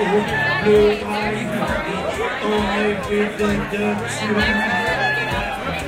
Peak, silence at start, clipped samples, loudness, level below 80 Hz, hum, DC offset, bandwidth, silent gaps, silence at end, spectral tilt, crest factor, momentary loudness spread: -4 dBFS; 0 s; under 0.1%; -19 LUFS; -38 dBFS; none; under 0.1%; 16 kHz; none; 0 s; -5 dB/octave; 16 dB; 7 LU